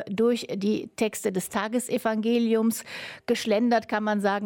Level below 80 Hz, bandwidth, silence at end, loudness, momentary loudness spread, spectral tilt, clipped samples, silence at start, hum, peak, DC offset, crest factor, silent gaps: -68 dBFS; 17.5 kHz; 0 s; -26 LUFS; 6 LU; -4.5 dB/octave; under 0.1%; 0 s; none; -12 dBFS; under 0.1%; 14 dB; none